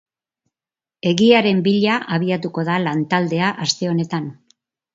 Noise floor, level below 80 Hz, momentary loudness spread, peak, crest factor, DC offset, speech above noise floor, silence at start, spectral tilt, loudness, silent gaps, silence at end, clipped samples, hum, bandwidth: under -90 dBFS; -62 dBFS; 10 LU; 0 dBFS; 20 dB; under 0.1%; over 72 dB; 1.05 s; -5.5 dB/octave; -18 LUFS; none; 0.6 s; under 0.1%; none; 7.8 kHz